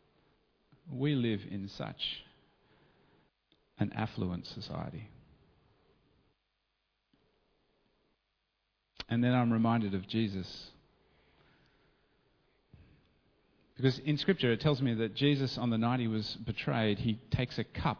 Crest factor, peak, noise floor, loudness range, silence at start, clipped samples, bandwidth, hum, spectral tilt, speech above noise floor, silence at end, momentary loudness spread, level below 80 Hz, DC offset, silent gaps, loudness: 22 dB; -14 dBFS; -81 dBFS; 12 LU; 0.85 s; under 0.1%; 5.4 kHz; none; -7.5 dB/octave; 49 dB; 0 s; 13 LU; -60 dBFS; under 0.1%; none; -33 LUFS